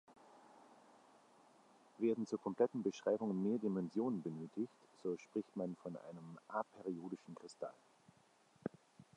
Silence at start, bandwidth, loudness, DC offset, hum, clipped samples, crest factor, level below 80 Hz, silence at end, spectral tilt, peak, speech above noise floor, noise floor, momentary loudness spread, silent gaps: 0.1 s; 11 kHz; -43 LUFS; under 0.1%; none; under 0.1%; 22 dB; -86 dBFS; 0.15 s; -7.5 dB/octave; -22 dBFS; 30 dB; -72 dBFS; 13 LU; none